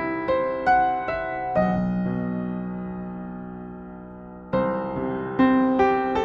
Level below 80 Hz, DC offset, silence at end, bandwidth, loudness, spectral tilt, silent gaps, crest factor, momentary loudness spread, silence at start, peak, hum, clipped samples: -48 dBFS; under 0.1%; 0 s; 6.6 kHz; -24 LUFS; -8.5 dB/octave; none; 16 dB; 18 LU; 0 s; -8 dBFS; none; under 0.1%